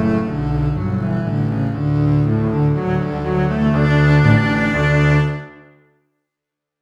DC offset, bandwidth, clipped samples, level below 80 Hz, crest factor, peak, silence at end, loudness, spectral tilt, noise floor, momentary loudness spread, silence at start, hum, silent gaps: under 0.1%; 7.4 kHz; under 0.1%; -32 dBFS; 16 dB; 0 dBFS; 1.3 s; -17 LUFS; -8.5 dB/octave; -82 dBFS; 7 LU; 0 s; none; none